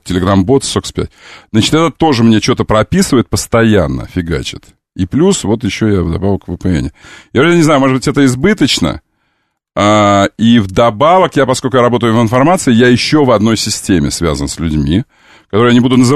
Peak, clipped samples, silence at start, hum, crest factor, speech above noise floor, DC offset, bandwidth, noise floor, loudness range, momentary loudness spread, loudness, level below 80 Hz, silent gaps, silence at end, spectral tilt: 0 dBFS; under 0.1%; 0.05 s; none; 10 dB; 54 dB; 0.2%; 14 kHz; -64 dBFS; 4 LU; 9 LU; -11 LUFS; -32 dBFS; none; 0 s; -5.5 dB/octave